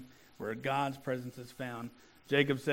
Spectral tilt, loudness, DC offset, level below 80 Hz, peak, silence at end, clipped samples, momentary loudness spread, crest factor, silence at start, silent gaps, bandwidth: -6 dB/octave; -35 LUFS; under 0.1%; -70 dBFS; -12 dBFS; 0 s; under 0.1%; 15 LU; 24 dB; 0 s; none; 17 kHz